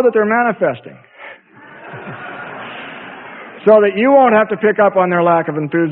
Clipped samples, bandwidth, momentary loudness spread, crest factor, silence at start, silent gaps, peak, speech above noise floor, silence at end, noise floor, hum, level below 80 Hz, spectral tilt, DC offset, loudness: under 0.1%; 4.1 kHz; 21 LU; 14 dB; 0 s; none; 0 dBFS; 27 dB; 0 s; -40 dBFS; none; -60 dBFS; -10.5 dB/octave; under 0.1%; -13 LUFS